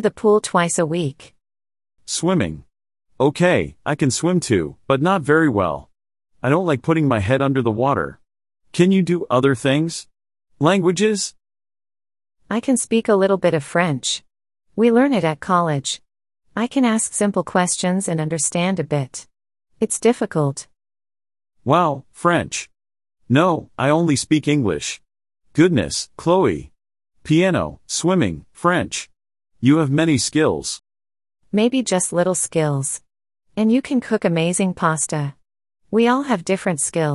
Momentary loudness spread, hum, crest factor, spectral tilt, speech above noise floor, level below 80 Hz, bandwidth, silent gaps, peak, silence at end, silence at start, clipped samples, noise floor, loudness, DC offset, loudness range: 10 LU; none; 18 dB; -5 dB/octave; over 72 dB; -50 dBFS; 12 kHz; none; -2 dBFS; 0 s; 0 s; under 0.1%; under -90 dBFS; -19 LUFS; under 0.1%; 3 LU